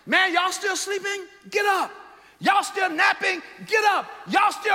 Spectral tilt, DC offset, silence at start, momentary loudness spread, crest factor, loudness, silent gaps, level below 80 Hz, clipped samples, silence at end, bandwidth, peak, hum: -1.5 dB/octave; under 0.1%; 0.05 s; 8 LU; 16 dB; -22 LUFS; none; -72 dBFS; under 0.1%; 0 s; 16.5 kHz; -8 dBFS; none